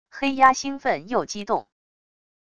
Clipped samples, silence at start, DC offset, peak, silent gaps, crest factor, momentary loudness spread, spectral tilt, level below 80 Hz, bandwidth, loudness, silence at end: under 0.1%; 0.1 s; under 0.1%; -2 dBFS; none; 22 dB; 9 LU; -3 dB/octave; -60 dBFS; 11 kHz; -22 LUFS; 0.8 s